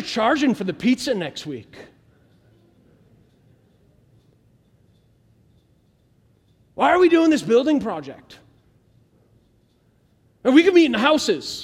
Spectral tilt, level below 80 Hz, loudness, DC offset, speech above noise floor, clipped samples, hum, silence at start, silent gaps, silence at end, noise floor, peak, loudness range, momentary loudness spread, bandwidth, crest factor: -4.5 dB/octave; -60 dBFS; -18 LUFS; under 0.1%; 42 dB; under 0.1%; none; 0 s; none; 0 s; -61 dBFS; -2 dBFS; 9 LU; 18 LU; 13.5 kHz; 20 dB